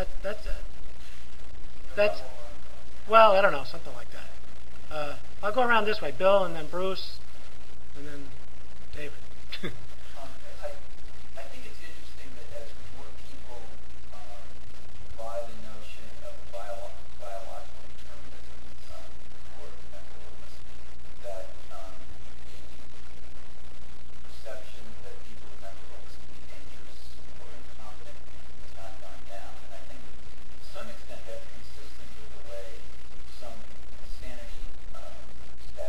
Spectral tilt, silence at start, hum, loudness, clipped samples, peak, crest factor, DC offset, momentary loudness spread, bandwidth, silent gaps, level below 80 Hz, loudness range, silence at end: -5 dB/octave; 0 s; none; -29 LUFS; under 0.1%; -4 dBFS; 28 dB; 9%; 23 LU; 16 kHz; none; -48 dBFS; 22 LU; 0 s